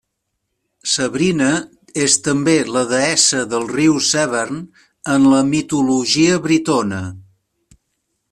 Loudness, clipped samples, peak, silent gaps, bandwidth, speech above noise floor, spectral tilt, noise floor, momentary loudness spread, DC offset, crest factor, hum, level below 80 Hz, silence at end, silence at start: -16 LUFS; under 0.1%; 0 dBFS; none; 13 kHz; 58 dB; -3.5 dB/octave; -74 dBFS; 12 LU; under 0.1%; 16 dB; none; -54 dBFS; 1.1 s; 0.85 s